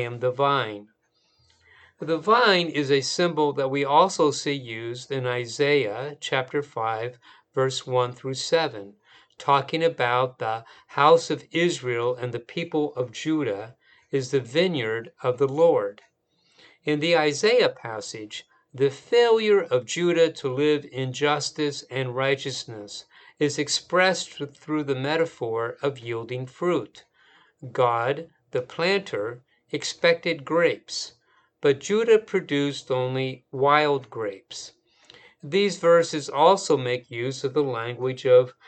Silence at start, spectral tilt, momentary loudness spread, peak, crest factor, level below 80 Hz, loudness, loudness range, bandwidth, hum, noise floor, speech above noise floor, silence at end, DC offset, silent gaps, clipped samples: 0 s; -4.5 dB/octave; 14 LU; -4 dBFS; 20 dB; -74 dBFS; -24 LUFS; 5 LU; 9 kHz; none; -67 dBFS; 43 dB; 0.15 s; under 0.1%; none; under 0.1%